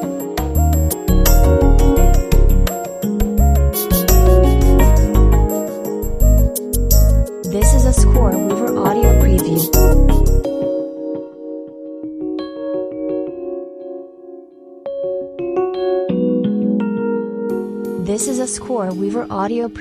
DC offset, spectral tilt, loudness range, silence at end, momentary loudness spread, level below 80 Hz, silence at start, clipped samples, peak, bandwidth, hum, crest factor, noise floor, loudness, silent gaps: under 0.1%; -6.5 dB/octave; 11 LU; 0 s; 14 LU; -16 dBFS; 0 s; under 0.1%; 0 dBFS; 15.5 kHz; none; 14 dB; -39 dBFS; -16 LUFS; none